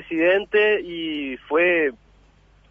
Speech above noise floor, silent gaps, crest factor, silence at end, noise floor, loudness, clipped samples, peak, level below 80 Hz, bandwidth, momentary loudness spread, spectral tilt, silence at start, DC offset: 34 dB; none; 14 dB; 0.75 s; -55 dBFS; -21 LUFS; under 0.1%; -8 dBFS; -56 dBFS; 5.4 kHz; 10 LU; -6.5 dB/octave; 0 s; under 0.1%